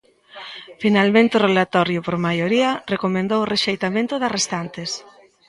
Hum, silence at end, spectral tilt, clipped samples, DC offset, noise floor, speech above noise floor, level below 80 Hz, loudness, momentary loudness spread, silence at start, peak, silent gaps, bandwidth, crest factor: none; 0.5 s; -4.5 dB/octave; under 0.1%; under 0.1%; -40 dBFS; 21 dB; -60 dBFS; -19 LUFS; 14 LU; 0.35 s; -2 dBFS; none; 11.5 kHz; 18 dB